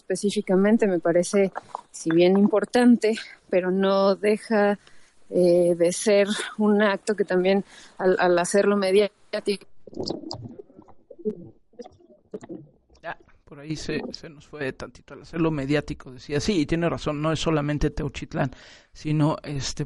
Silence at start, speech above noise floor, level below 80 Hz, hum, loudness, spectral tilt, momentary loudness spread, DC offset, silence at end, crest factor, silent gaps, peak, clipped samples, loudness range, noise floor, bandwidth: 0.1 s; 29 dB; -46 dBFS; none; -23 LUFS; -5.5 dB/octave; 19 LU; under 0.1%; 0 s; 14 dB; none; -8 dBFS; under 0.1%; 15 LU; -52 dBFS; 11.5 kHz